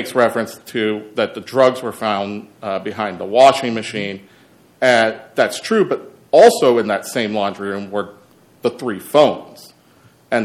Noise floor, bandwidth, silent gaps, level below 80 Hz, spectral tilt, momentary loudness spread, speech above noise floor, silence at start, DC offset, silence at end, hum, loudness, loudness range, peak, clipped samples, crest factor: -51 dBFS; 15.5 kHz; none; -66 dBFS; -4.5 dB/octave; 14 LU; 34 dB; 0 s; under 0.1%; 0 s; none; -17 LUFS; 5 LU; 0 dBFS; under 0.1%; 18 dB